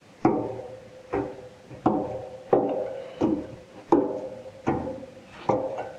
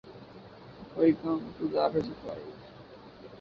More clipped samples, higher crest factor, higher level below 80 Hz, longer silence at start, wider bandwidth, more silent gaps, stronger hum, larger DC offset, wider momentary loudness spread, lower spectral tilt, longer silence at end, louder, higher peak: neither; about the same, 24 dB vs 20 dB; first, -56 dBFS vs -62 dBFS; first, 0.2 s vs 0.05 s; first, 9 kHz vs 6 kHz; neither; neither; neither; second, 18 LU vs 23 LU; about the same, -8 dB/octave vs -8.5 dB/octave; about the same, 0 s vs 0 s; about the same, -28 LUFS vs -30 LUFS; first, -4 dBFS vs -12 dBFS